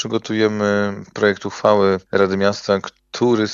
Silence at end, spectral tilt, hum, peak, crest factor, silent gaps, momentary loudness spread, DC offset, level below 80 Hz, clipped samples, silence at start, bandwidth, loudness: 0 s; -5.5 dB/octave; none; -2 dBFS; 16 dB; none; 6 LU; under 0.1%; -62 dBFS; under 0.1%; 0 s; 7.6 kHz; -18 LUFS